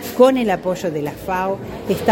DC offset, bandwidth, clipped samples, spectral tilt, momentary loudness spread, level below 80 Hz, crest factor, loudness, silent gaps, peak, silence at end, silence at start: under 0.1%; 17 kHz; under 0.1%; -6 dB/octave; 10 LU; -46 dBFS; 18 dB; -19 LUFS; none; 0 dBFS; 0 s; 0 s